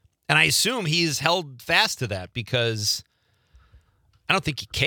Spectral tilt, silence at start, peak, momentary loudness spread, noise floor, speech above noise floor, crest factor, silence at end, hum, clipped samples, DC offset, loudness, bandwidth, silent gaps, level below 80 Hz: -3 dB/octave; 0.3 s; -2 dBFS; 10 LU; -62 dBFS; 39 dB; 24 dB; 0 s; none; under 0.1%; under 0.1%; -22 LUFS; 19.5 kHz; none; -54 dBFS